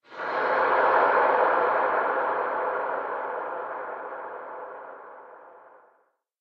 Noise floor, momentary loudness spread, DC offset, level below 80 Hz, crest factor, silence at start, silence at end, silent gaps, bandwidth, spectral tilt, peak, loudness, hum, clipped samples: -68 dBFS; 19 LU; under 0.1%; -72 dBFS; 18 dB; 0.1 s; 0.8 s; none; 6 kHz; -5.5 dB/octave; -8 dBFS; -25 LUFS; none; under 0.1%